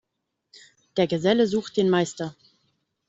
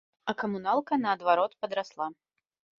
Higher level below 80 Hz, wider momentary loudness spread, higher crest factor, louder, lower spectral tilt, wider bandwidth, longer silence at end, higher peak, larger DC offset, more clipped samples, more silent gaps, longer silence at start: first, -64 dBFS vs -76 dBFS; about the same, 12 LU vs 10 LU; about the same, 18 dB vs 20 dB; first, -23 LUFS vs -29 LUFS; about the same, -5.5 dB/octave vs -6 dB/octave; about the same, 8 kHz vs 7.4 kHz; about the same, 0.75 s vs 0.65 s; about the same, -8 dBFS vs -10 dBFS; neither; neither; neither; first, 0.95 s vs 0.25 s